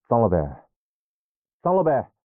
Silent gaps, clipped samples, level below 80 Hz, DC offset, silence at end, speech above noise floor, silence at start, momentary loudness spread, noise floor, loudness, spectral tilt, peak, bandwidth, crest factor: 0.76-1.44 s, 1.53-1.60 s; under 0.1%; -48 dBFS; under 0.1%; 0.2 s; over 69 dB; 0.1 s; 9 LU; under -90 dBFS; -22 LUFS; -10.5 dB/octave; -8 dBFS; 3 kHz; 16 dB